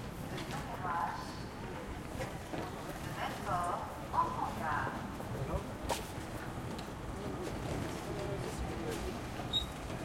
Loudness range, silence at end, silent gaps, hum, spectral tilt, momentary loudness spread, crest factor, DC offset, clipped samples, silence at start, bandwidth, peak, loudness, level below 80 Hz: 3 LU; 0 s; none; none; -5 dB/octave; 7 LU; 20 dB; under 0.1%; under 0.1%; 0 s; 16.5 kHz; -20 dBFS; -39 LUFS; -50 dBFS